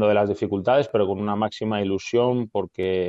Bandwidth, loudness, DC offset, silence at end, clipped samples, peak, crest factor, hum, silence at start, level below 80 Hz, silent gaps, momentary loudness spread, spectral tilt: 7.8 kHz; -23 LUFS; under 0.1%; 0 s; under 0.1%; -8 dBFS; 14 dB; none; 0 s; -64 dBFS; none; 5 LU; -6.5 dB/octave